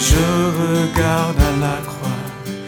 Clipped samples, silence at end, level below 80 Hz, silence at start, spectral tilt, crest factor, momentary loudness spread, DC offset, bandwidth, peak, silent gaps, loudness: under 0.1%; 0 s; -24 dBFS; 0 s; -5 dB/octave; 16 dB; 9 LU; under 0.1%; over 20 kHz; -2 dBFS; none; -18 LUFS